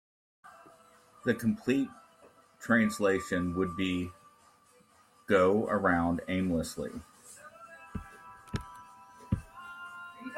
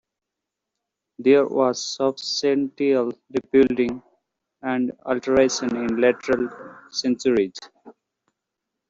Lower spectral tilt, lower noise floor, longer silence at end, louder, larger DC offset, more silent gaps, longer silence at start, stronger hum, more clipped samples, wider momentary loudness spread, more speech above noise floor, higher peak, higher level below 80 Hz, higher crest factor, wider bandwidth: first, -6 dB/octave vs -4 dB/octave; second, -63 dBFS vs -84 dBFS; second, 0 s vs 1 s; second, -31 LUFS vs -22 LUFS; neither; neither; second, 0.45 s vs 1.2 s; neither; neither; first, 23 LU vs 11 LU; second, 34 dB vs 63 dB; second, -12 dBFS vs -4 dBFS; about the same, -56 dBFS vs -58 dBFS; about the same, 20 dB vs 18 dB; first, 16 kHz vs 7.8 kHz